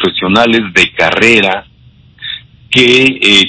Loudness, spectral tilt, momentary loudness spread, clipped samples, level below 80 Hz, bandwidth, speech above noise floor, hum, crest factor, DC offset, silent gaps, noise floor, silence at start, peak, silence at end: -8 LUFS; -3.5 dB/octave; 17 LU; 3%; -42 dBFS; 8 kHz; 34 dB; none; 10 dB; under 0.1%; none; -42 dBFS; 0 s; 0 dBFS; 0 s